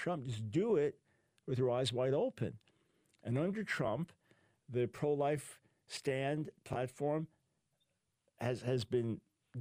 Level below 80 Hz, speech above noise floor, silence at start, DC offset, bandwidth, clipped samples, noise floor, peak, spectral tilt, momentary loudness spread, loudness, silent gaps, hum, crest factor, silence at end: -72 dBFS; 46 dB; 0 s; under 0.1%; 15.5 kHz; under 0.1%; -83 dBFS; -22 dBFS; -6.5 dB/octave; 12 LU; -38 LUFS; none; none; 16 dB; 0 s